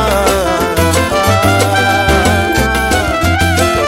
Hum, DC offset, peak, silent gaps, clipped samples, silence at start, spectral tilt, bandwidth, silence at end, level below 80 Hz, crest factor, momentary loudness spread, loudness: none; under 0.1%; 0 dBFS; none; under 0.1%; 0 s; -4.5 dB/octave; 16.5 kHz; 0 s; -22 dBFS; 12 dB; 2 LU; -11 LUFS